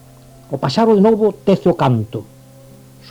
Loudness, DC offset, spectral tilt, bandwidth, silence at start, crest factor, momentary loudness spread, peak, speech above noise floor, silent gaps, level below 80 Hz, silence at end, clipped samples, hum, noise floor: -15 LUFS; under 0.1%; -8 dB/octave; 14 kHz; 0.5 s; 16 dB; 16 LU; 0 dBFS; 28 dB; none; -50 dBFS; 0.9 s; under 0.1%; none; -42 dBFS